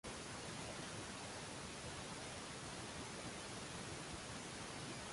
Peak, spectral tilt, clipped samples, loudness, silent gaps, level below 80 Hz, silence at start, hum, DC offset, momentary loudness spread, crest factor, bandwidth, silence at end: -36 dBFS; -3 dB/octave; under 0.1%; -48 LUFS; none; -66 dBFS; 0.05 s; none; under 0.1%; 1 LU; 14 dB; 11.5 kHz; 0 s